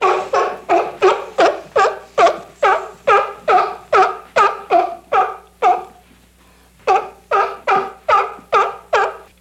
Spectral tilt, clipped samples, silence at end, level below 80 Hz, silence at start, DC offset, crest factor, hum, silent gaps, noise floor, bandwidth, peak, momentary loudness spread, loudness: -3 dB/octave; under 0.1%; 0.2 s; -54 dBFS; 0 s; under 0.1%; 16 dB; none; none; -49 dBFS; 13.5 kHz; -2 dBFS; 4 LU; -16 LUFS